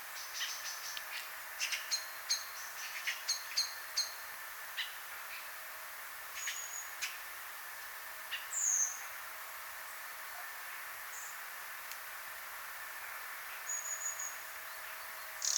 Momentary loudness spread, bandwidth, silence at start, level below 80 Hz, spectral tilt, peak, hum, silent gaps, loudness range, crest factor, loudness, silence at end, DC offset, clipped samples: 9 LU; 19 kHz; 0 s; -80 dBFS; 3.5 dB/octave; -18 dBFS; none; none; 6 LU; 24 dB; -39 LUFS; 0 s; under 0.1%; under 0.1%